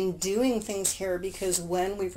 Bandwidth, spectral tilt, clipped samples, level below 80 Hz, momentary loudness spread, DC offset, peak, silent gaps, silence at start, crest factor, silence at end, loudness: 16 kHz; -3.5 dB/octave; under 0.1%; -52 dBFS; 4 LU; under 0.1%; -10 dBFS; none; 0 s; 18 dB; 0 s; -28 LUFS